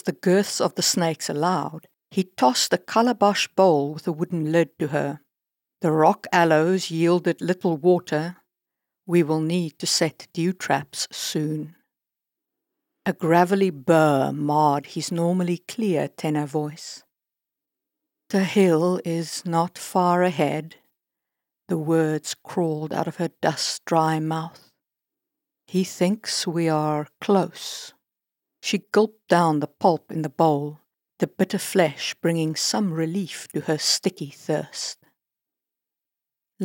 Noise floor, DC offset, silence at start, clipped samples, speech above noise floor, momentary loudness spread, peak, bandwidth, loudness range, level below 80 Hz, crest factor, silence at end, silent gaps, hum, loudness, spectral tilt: -87 dBFS; under 0.1%; 0.05 s; under 0.1%; 65 dB; 11 LU; -4 dBFS; 17.5 kHz; 5 LU; -82 dBFS; 20 dB; 0 s; none; none; -23 LUFS; -5 dB/octave